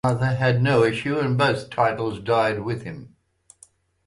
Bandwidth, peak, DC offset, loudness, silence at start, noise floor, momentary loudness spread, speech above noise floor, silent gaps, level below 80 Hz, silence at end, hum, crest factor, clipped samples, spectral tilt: 11.5 kHz; -6 dBFS; under 0.1%; -22 LUFS; 0.05 s; -57 dBFS; 11 LU; 35 dB; none; -54 dBFS; 1 s; none; 16 dB; under 0.1%; -7 dB/octave